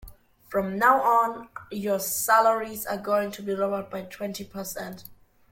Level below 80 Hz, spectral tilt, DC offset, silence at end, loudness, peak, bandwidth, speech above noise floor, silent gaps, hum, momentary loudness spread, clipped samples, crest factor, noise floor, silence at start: -58 dBFS; -3.5 dB/octave; under 0.1%; 0.35 s; -25 LUFS; -6 dBFS; 17 kHz; 23 dB; none; none; 16 LU; under 0.1%; 20 dB; -48 dBFS; 0 s